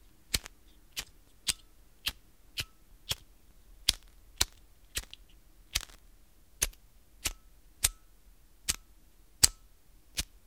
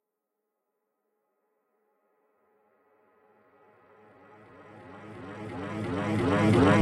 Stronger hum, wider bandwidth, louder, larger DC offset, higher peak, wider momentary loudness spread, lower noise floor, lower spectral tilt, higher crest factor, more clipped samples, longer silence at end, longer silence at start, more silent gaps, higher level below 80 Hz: neither; first, 17.5 kHz vs 12 kHz; second, -33 LUFS vs -27 LUFS; neither; first, 0 dBFS vs -10 dBFS; second, 14 LU vs 27 LU; second, -61 dBFS vs -84 dBFS; second, 0 dB/octave vs -7 dB/octave; first, 38 dB vs 22 dB; neither; first, 0.2 s vs 0 s; second, 0.3 s vs 4.6 s; neither; first, -50 dBFS vs -58 dBFS